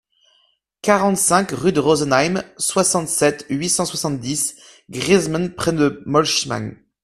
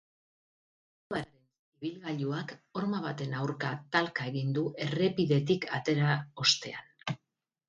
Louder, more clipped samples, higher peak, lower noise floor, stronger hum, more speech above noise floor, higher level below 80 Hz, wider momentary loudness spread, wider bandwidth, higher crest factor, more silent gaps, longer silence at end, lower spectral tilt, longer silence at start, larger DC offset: first, -18 LUFS vs -32 LUFS; neither; first, 0 dBFS vs -10 dBFS; second, -62 dBFS vs -85 dBFS; neither; second, 44 dB vs 53 dB; first, -52 dBFS vs -70 dBFS; second, 8 LU vs 13 LU; first, 15.5 kHz vs 9 kHz; about the same, 20 dB vs 22 dB; second, none vs 1.59-1.72 s; second, 0.3 s vs 0.5 s; second, -3.5 dB/octave vs -5 dB/octave; second, 0.85 s vs 1.1 s; neither